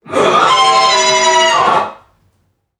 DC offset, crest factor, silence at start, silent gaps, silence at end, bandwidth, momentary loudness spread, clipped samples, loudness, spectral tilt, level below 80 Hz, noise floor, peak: under 0.1%; 12 dB; 0.05 s; none; 0.85 s; 12 kHz; 5 LU; under 0.1%; -10 LUFS; -1 dB/octave; -58 dBFS; -61 dBFS; 0 dBFS